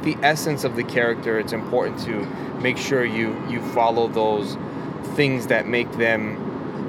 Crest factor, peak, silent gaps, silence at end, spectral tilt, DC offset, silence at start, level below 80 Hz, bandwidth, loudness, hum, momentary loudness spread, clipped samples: 20 dB; -2 dBFS; none; 0 s; -5.5 dB/octave; under 0.1%; 0 s; -56 dBFS; 17 kHz; -22 LUFS; none; 9 LU; under 0.1%